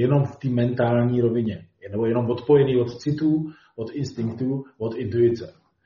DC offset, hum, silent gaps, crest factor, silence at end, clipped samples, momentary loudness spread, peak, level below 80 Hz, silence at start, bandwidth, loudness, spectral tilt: under 0.1%; none; none; 16 dB; 0.35 s; under 0.1%; 13 LU; -6 dBFS; -58 dBFS; 0 s; 7.2 kHz; -23 LUFS; -8 dB/octave